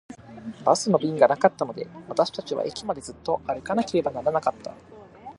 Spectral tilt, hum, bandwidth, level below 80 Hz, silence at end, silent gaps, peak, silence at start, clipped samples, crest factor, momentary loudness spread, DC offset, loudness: -5 dB/octave; none; 11.5 kHz; -60 dBFS; 0.05 s; none; -2 dBFS; 0.1 s; under 0.1%; 22 dB; 20 LU; under 0.1%; -25 LUFS